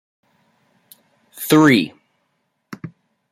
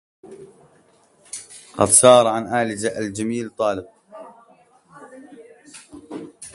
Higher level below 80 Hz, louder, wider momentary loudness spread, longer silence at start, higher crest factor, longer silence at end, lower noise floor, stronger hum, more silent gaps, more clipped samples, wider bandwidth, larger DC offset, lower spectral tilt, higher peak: about the same, -62 dBFS vs -58 dBFS; about the same, -15 LUFS vs -17 LUFS; about the same, 26 LU vs 25 LU; first, 1.35 s vs 0.3 s; about the same, 20 dB vs 22 dB; first, 0.45 s vs 0.05 s; first, -70 dBFS vs -56 dBFS; neither; neither; neither; first, 16 kHz vs 12 kHz; neither; first, -5 dB/octave vs -3 dB/octave; about the same, -2 dBFS vs 0 dBFS